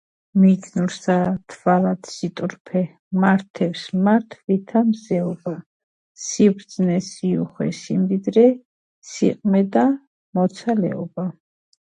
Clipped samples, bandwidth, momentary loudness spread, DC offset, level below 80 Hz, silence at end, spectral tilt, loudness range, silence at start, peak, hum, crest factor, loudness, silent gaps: under 0.1%; 9.4 kHz; 12 LU; under 0.1%; -64 dBFS; 0.55 s; -7 dB/octave; 2 LU; 0.35 s; -4 dBFS; none; 18 dB; -21 LUFS; 2.60-2.65 s, 2.99-3.11 s, 3.50-3.54 s, 5.66-6.15 s, 8.65-9.02 s, 10.07-10.33 s